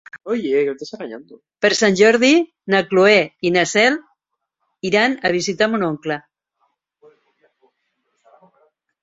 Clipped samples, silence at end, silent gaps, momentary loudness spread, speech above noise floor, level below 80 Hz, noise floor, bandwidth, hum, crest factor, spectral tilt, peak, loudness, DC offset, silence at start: under 0.1%; 2.85 s; none; 16 LU; 59 dB; -62 dBFS; -76 dBFS; 8 kHz; none; 18 dB; -4 dB/octave; -2 dBFS; -17 LUFS; under 0.1%; 0.15 s